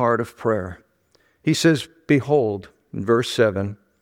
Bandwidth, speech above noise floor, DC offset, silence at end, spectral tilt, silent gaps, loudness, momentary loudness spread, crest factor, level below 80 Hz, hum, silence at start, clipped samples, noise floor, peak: 16.5 kHz; 42 dB; under 0.1%; 0.3 s; -5.5 dB/octave; none; -21 LUFS; 13 LU; 18 dB; -58 dBFS; none; 0 s; under 0.1%; -62 dBFS; -4 dBFS